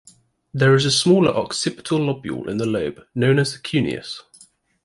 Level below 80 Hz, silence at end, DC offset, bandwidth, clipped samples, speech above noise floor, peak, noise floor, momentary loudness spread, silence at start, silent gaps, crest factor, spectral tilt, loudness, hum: -54 dBFS; 0.65 s; under 0.1%; 11.5 kHz; under 0.1%; 33 dB; -4 dBFS; -52 dBFS; 12 LU; 0.55 s; none; 16 dB; -5 dB/octave; -20 LUFS; none